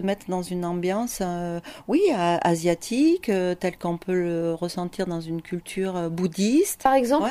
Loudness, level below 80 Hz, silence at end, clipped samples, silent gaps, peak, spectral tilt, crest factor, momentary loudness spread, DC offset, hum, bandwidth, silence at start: -24 LUFS; -54 dBFS; 0 s; under 0.1%; none; -6 dBFS; -5.5 dB/octave; 18 dB; 9 LU; under 0.1%; none; 15.5 kHz; 0 s